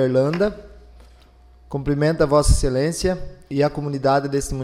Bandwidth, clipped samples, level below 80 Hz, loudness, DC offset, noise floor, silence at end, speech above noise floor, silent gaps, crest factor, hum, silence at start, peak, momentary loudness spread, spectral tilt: 15 kHz; under 0.1%; -30 dBFS; -21 LUFS; under 0.1%; -49 dBFS; 0 s; 30 dB; none; 16 dB; none; 0 s; -4 dBFS; 11 LU; -6 dB/octave